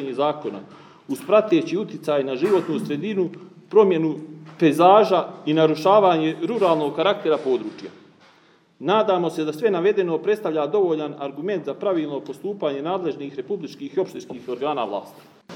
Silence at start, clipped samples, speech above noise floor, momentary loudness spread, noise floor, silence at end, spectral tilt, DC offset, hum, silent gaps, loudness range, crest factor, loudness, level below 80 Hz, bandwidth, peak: 0 s; under 0.1%; 35 dB; 15 LU; -56 dBFS; 0 s; -6.5 dB/octave; under 0.1%; none; none; 9 LU; 20 dB; -21 LUFS; -82 dBFS; 16 kHz; -2 dBFS